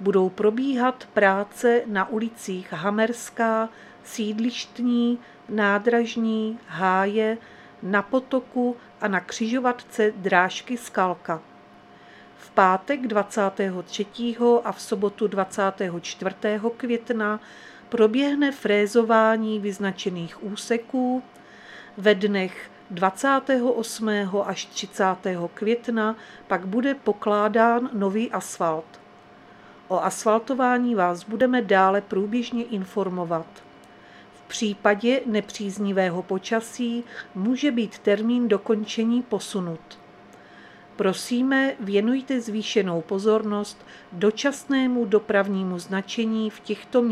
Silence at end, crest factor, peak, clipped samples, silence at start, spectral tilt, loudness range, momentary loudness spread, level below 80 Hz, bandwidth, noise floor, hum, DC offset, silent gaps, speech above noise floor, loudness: 0 s; 22 dB; -2 dBFS; under 0.1%; 0 s; -5 dB/octave; 3 LU; 10 LU; -70 dBFS; 14 kHz; -49 dBFS; none; under 0.1%; none; 26 dB; -24 LUFS